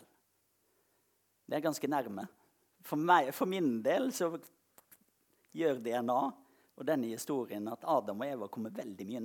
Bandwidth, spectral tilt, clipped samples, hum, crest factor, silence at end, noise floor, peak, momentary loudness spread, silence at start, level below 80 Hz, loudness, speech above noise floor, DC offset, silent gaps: 19 kHz; -5 dB/octave; under 0.1%; none; 24 dB; 0 s; -76 dBFS; -12 dBFS; 14 LU; 1.5 s; -90 dBFS; -34 LUFS; 42 dB; under 0.1%; none